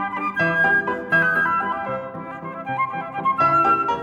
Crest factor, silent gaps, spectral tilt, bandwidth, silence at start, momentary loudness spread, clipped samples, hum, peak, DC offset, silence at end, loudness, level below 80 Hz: 14 dB; none; -6.5 dB/octave; 12 kHz; 0 s; 13 LU; under 0.1%; none; -6 dBFS; under 0.1%; 0 s; -20 LUFS; -56 dBFS